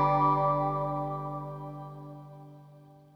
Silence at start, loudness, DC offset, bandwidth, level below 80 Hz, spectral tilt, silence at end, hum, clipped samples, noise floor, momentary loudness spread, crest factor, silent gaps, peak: 0 s; -30 LUFS; under 0.1%; 5.8 kHz; -56 dBFS; -9.5 dB/octave; 0.2 s; none; under 0.1%; -54 dBFS; 23 LU; 16 dB; none; -14 dBFS